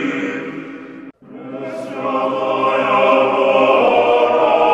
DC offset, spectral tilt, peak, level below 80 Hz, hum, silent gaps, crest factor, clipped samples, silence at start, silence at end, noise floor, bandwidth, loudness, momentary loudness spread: under 0.1%; -5.5 dB/octave; -2 dBFS; -60 dBFS; none; none; 14 dB; under 0.1%; 0 s; 0 s; -36 dBFS; 9.2 kHz; -15 LUFS; 19 LU